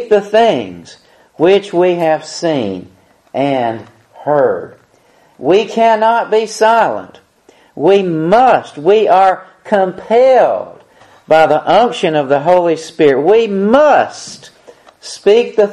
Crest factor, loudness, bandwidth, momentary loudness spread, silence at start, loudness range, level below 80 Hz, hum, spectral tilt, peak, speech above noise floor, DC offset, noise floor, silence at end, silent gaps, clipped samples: 12 dB; -12 LUFS; 12 kHz; 13 LU; 0 s; 5 LU; -56 dBFS; none; -5.5 dB/octave; 0 dBFS; 38 dB; under 0.1%; -50 dBFS; 0 s; none; under 0.1%